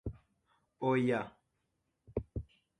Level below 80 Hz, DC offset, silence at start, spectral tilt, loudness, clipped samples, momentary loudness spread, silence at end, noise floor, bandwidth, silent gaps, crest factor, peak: -54 dBFS; under 0.1%; 0.05 s; -8 dB/octave; -35 LUFS; under 0.1%; 16 LU; 0.35 s; -82 dBFS; 9.8 kHz; none; 20 dB; -18 dBFS